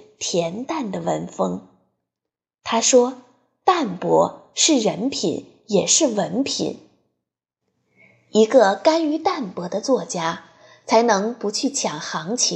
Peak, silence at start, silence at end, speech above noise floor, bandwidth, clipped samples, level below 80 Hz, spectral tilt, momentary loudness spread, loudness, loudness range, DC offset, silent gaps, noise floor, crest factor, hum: -2 dBFS; 0.2 s; 0 s; 66 dB; 11 kHz; under 0.1%; -66 dBFS; -3 dB/octave; 11 LU; -20 LUFS; 3 LU; under 0.1%; none; -86 dBFS; 20 dB; none